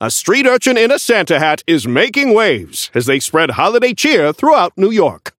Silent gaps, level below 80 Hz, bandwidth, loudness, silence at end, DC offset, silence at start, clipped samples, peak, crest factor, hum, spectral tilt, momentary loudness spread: none; -56 dBFS; 17 kHz; -12 LUFS; 0.1 s; under 0.1%; 0 s; under 0.1%; 0 dBFS; 12 dB; none; -3.5 dB/octave; 4 LU